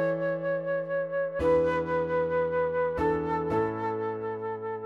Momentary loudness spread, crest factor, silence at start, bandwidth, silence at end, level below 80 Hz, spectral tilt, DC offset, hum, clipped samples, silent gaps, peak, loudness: 7 LU; 12 dB; 0 s; 6.8 kHz; 0 s; -52 dBFS; -8 dB/octave; under 0.1%; none; under 0.1%; none; -16 dBFS; -28 LUFS